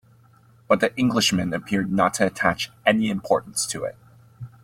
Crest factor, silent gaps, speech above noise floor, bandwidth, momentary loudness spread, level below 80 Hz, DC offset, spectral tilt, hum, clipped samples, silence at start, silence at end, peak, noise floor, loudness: 20 dB; none; 32 dB; 16 kHz; 8 LU; -56 dBFS; under 0.1%; -4 dB/octave; none; under 0.1%; 0.7 s; 0.15 s; -2 dBFS; -54 dBFS; -22 LUFS